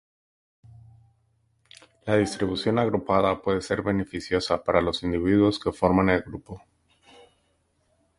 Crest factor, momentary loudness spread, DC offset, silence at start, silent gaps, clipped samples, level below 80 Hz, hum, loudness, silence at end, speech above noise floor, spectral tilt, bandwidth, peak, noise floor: 22 dB; 9 LU; under 0.1%; 2.05 s; none; under 0.1%; -48 dBFS; none; -24 LUFS; 1.6 s; 45 dB; -6 dB/octave; 11.5 kHz; -4 dBFS; -69 dBFS